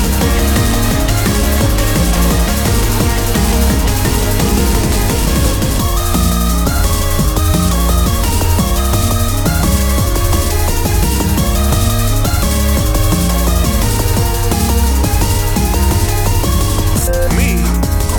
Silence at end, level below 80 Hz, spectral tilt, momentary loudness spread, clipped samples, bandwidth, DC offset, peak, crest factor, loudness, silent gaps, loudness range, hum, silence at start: 0 s; -14 dBFS; -4.5 dB/octave; 1 LU; under 0.1%; 19.5 kHz; under 0.1%; 0 dBFS; 12 dB; -14 LUFS; none; 1 LU; none; 0 s